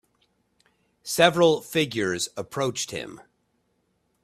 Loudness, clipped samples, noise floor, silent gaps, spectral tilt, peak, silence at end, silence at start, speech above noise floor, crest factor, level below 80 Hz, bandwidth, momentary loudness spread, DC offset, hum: -24 LUFS; under 0.1%; -71 dBFS; none; -3.5 dB/octave; -2 dBFS; 1.05 s; 1.05 s; 48 dB; 24 dB; -64 dBFS; 15.5 kHz; 16 LU; under 0.1%; none